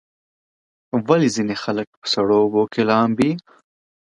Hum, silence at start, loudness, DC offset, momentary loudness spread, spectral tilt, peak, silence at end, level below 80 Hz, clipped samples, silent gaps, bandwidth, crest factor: none; 0.95 s; -19 LUFS; under 0.1%; 9 LU; -5.5 dB/octave; 0 dBFS; 0.75 s; -60 dBFS; under 0.1%; 1.87-2.02 s; 11 kHz; 20 dB